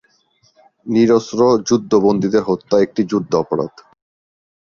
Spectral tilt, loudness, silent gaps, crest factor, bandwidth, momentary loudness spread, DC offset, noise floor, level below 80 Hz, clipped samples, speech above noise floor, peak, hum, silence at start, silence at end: -6 dB/octave; -16 LUFS; none; 14 dB; 7.2 kHz; 8 LU; under 0.1%; -58 dBFS; -54 dBFS; under 0.1%; 43 dB; -2 dBFS; none; 0.85 s; 1.1 s